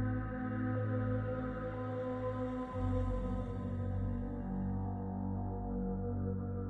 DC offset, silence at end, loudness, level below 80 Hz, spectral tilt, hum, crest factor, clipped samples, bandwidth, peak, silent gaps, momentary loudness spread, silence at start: under 0.1%; 0 s; -38 LUFS; -46 dBFS; -10.5 dB/octave; none; 14 dB; under 0.1%; 4 kHz; -24 dBFS; none; 4 LU; 0 s